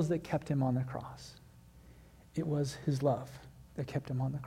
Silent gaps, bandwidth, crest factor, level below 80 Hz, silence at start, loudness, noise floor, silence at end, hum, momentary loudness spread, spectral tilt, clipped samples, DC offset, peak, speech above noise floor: none; 15 kHz; 18 dB; -60 dBFS; 0 s; -35 LUFS; -57 dBFS; 0 s; none; 17 LU; -7.5 dB/octave; under 0.1%; under 0.1%; -18 dBFS; 23 dB